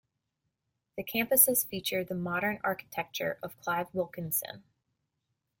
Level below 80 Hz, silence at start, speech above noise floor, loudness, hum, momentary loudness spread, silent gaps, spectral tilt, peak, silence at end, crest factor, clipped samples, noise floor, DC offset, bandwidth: -70 dBFS; 0.95 s; 52 dB; -30 LUFS; none; 16 LU; none; -3 dB/octave; -8 dBFS; 1 s; 26 dB; under 0.1%; -83 dBFS; under 0.1%; 17 kHz